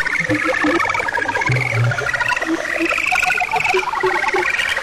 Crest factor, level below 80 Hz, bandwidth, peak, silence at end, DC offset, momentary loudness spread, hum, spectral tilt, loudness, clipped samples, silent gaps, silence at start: 10 dB; -44 dBFS; 15.5 kHz; -8 dBFS; 0 s; under 0.1%; 3 LU; none; -4.5 dB/octave; -17 LUFS; under 0.1%; none; 0 s